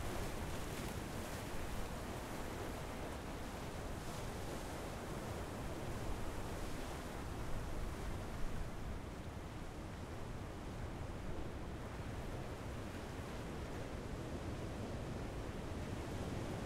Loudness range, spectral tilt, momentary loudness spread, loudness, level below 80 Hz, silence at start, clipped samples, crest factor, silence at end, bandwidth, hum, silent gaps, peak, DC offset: 2 LU; -5.5 dB/octave; 3 LU; -46 LUFS; -50 dBFS; 0 s; under 0.1%; 16 dB; 0 s; 16 kHz; none; none; -28 dBFS; under 0.1%